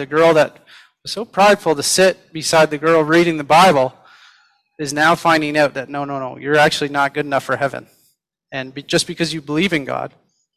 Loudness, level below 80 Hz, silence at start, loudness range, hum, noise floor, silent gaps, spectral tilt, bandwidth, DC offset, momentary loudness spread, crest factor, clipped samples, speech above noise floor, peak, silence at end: -16 LUFS; -56 dBFS; 0 s; 6 LU; none; -63 dBFS; none; -4 dB/octave; 15.5 kHz; under 0.1%; 14 LU; 14 dB; under 0.1%; 46 dB; -2 dBFS; 0.5 s